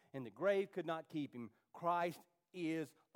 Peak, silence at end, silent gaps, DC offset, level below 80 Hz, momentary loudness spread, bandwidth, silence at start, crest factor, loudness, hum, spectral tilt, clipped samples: -24 dBFS; 0.25 s; none; under 0.1%; under -90 dBFS; 16 LU; 17 kHz; 0.15 s; 18 dB; -42 LUFS; none; -6.5 dB/octave; under 0.1%